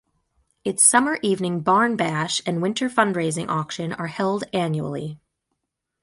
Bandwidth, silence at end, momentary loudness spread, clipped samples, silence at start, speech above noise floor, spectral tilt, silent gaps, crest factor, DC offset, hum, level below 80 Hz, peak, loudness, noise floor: 12 kHz; 0.85 s; 13 LU; under 0.1%; 0.65 s; 57 dB; -3.5 dB/octave; none; 20 dB; under 0.1%; none; -62 dBFS; -2 dBFS; -21 LUFS; -79 dBFS